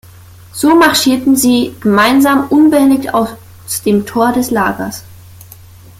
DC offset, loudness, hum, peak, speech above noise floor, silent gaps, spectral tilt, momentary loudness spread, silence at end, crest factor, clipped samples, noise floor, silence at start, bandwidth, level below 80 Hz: under 0.1%; -11 LUFS; none; 0 dBFS; 26 dB; none; -4 dB/octave; 13 LU; 0.85 s; 12 dB; under 0.1%; -37 dBFS; 0.55 s; 16.5 kHz; -46 dBFS